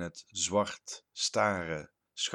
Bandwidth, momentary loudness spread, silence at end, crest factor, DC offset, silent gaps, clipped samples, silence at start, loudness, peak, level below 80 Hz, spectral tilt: 13 kHz; 14 LU; 0 s; 22 dB; under 0.1%; none; under 0.1%; 0 s; -32 LUFS; -12 dBFS; -66 dBFS; -2.5 dB/octave